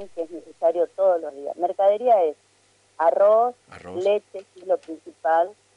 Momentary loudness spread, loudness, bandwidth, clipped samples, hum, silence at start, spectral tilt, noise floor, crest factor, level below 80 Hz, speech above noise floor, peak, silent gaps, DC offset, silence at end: 17 LU; -22 LUFS; 10.5 kHz; under 0.1%; 50 Hz at -70 dBFS; 0 s; -5.5 dB/octave; -61 dBFS; 14 dB; -76 dBFS; 39 dB; -8 dBFS; none; under 0.1%; 0.25 s